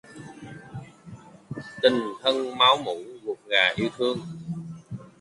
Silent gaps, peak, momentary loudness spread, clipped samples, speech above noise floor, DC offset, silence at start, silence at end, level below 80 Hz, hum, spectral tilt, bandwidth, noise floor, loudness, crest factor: none; -4 dBFS; 23 LU; under 0.1%; 23 dB; under 0.1%; 0.1 s; 0.1 s; -62 dBFS; none; -4.5 dB/octave; 11.5 kHz; -46 dBFS; -24 LUFS; 22 dB